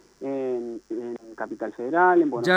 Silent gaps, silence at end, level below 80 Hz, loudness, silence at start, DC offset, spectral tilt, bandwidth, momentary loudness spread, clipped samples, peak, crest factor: none; 0 s; -70 dBFS; -25 LUFS; 0.2 s; under 0.1%; -6 dB/octave; 9.2 kHz; 16 LU; under 0.1%; -6 dBFS; 18 dB